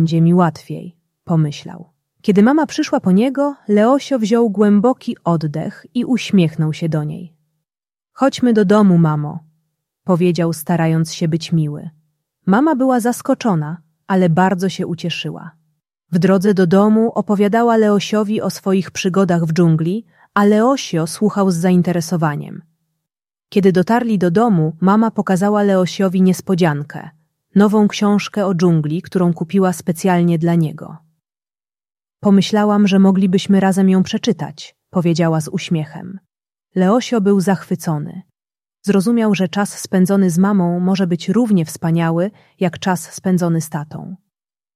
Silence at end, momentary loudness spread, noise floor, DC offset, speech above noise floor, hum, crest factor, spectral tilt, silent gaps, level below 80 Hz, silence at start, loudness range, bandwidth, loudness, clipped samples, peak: 0.6 s; 11 LU; under -90 dBFS; under 0.1%; over 75 dB; none; 14 dB; -7 dB/octave; none; -60 dBFS; 0 s; 4 LU; 14.5 kHz; -16 LUFS; under 0.1%; -2 dBFS